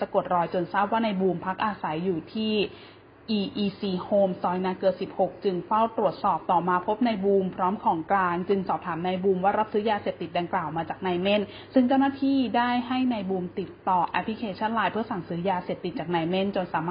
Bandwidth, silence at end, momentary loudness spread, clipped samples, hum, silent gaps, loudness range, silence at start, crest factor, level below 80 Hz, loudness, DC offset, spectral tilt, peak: 5.2 kHz; 0 s; 6 LU; under 0.1%; none; none; 3 LU; 0 s; 18 dB; -60 dBFS; -26 LUFS; under 0.1%; -10.5 dB/octave; -8 dBFS